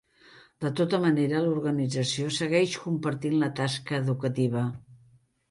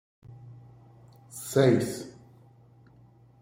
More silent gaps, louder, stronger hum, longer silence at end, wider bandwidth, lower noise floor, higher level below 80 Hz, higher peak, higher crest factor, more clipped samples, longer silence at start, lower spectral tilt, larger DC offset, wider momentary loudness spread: neither; about the same, -27 LUFS vs -26 LUFS; neither; second, 0.55 s vs 1.3 s; second, 11.5 kHz vs 16 kHz; first, -61 dBFS vs -57 dBFS; about the same, -66 dBFS vs -66 dBFS; about the same, -12 dBFS vs -10 dBFS; second, 16 dB vs 22 dB; neither; about the same, 0.35 s vs 0.3 s; about the same, -6 dB/octave vs -6 dB/octave; neither; second, 6 LU vs 27 LU